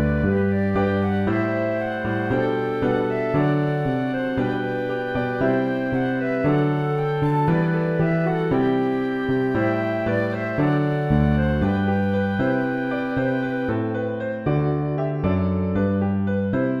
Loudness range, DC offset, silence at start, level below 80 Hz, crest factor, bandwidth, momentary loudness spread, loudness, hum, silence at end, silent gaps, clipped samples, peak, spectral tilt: 2 LU; under 0.1%; 0 s; -40 dBFS; 14 dB; 6 kHz; 4 LU; -22 LUFS; none; 0 s; none; under 0.1%; -6 dBFS; -9.5 dB/octave